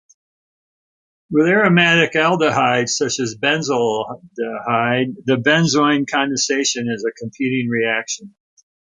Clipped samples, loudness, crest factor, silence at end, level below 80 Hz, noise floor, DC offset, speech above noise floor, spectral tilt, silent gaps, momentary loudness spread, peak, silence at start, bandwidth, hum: under 0.1%; -17 LUFS; 16 dB; 0.65 s; -60 dBFS; under -90 dBFS; under 0.1%; over 73 dB; -4 dB/octave; none; 12 LU; -2 dBFS; 1.3 s; 9.6 kHz; none